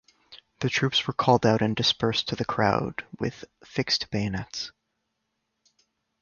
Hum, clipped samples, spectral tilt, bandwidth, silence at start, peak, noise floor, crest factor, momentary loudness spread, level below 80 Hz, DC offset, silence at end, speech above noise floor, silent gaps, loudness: none; under 0.1%; -5 dB/octave; 7.2 kHz; 0.3 s; -4 dBFS; -79 dBFS; 22 dB; 13 LU; -56 dBFS; under 0.1%; 1.55 s; 53 dB; none; -26 LUFS